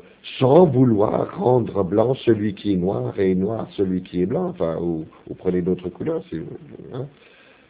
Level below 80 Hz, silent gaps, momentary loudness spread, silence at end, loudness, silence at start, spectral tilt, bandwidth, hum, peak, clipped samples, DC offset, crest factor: -48 dBFS; none; 18 LU; 0.6 s; -21 LUFS; 0.25 s; -12.5 dB/octave; 4 kHz; none; 0 dBFS; under 0.1%; under 0.1%; 20 dB